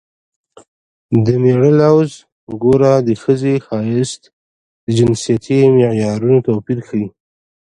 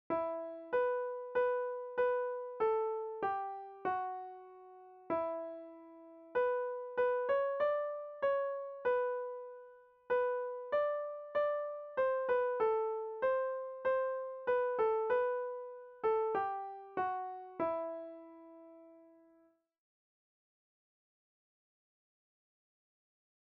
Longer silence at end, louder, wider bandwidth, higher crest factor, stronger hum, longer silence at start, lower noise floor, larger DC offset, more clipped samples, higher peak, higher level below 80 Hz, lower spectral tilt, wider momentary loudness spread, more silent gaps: second, 0.55 s vs 4.4 s; first, -14 LUFS vs -36 LUFS; first, 11 kHz vs 4.4 kHz; about the same, 14 dB vs 14 dB; neither; first, 1.1 s vs 0.1 s; first, under -90 dBFS vs -70 dBFS; neither; neither; first, 0 dBFS vs -22 dBFS; first, -50 dBFS vs -78 dBFS; first, -7.5 dB/octave vs -2.5 dB/octave; second, 11 LU vs 17 LU; first, 2.32-2.47 s, 4.33-4.87 s vs none